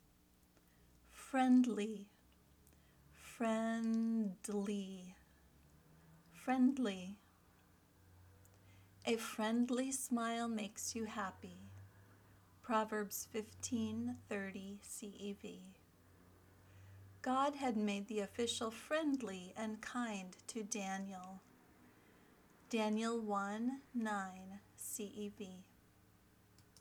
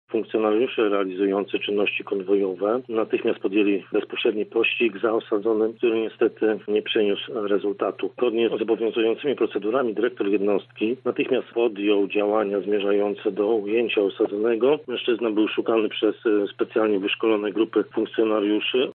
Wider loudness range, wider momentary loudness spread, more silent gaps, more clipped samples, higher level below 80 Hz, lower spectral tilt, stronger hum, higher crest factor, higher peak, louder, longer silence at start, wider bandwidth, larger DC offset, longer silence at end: first, 6 LU vs 1 LU; first, 19 LU vs 4 LU; neither; neither; first, -76 dBFS vs -82 dBFS; second, -4 dB/octave vs -9.5 dB/octave; first, 60 Hz at -80 dBFS vs none; about the same, 18 dB vs 14 dB; second, -24 dBFS vs -8 dBFS; second, -40 LUFS vs -23 LUFS; first, 1.15 s vs 0.1 s; first, 20 kHz vs 4.2 kHz; neither; about the same, 0 s vs 0 s